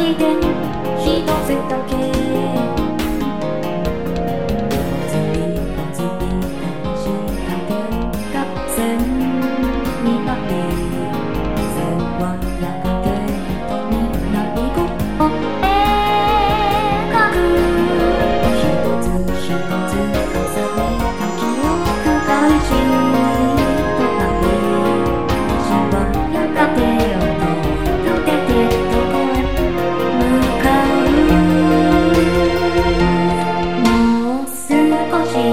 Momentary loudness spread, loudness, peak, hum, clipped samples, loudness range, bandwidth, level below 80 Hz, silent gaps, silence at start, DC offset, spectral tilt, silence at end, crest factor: 8 LU; -17 LUFS; 0 dBFS; none; under 0.1%; 7 LU; 17 kHz; -28 dBFS; none; 0 s; 4%; -6 dB/octave; 0 s; 16 dB